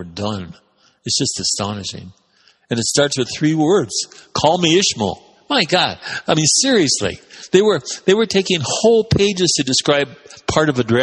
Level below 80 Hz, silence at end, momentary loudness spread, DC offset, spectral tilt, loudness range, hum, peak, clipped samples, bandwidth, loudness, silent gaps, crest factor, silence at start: -48 dBFS; 0 s; 11 LU; under 0.1%; -3.5 dB/octave; 4 LU; none; 0 dBFS; under 0.1%; 11.5 kHz; -16 LUFS; none; 18 dB; 0 s